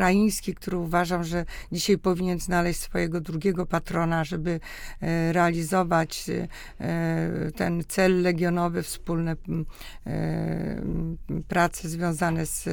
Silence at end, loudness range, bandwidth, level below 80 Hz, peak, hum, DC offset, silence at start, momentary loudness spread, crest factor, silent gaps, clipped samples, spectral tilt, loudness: 0 s; 3 LU; 19 kHz; -40 dBFS; -8 dBFS; none; under 0.1%; 0 s; 9 LU; 18 dB; none; under 0.1%; -5.5 dB/octave; -26 LUFS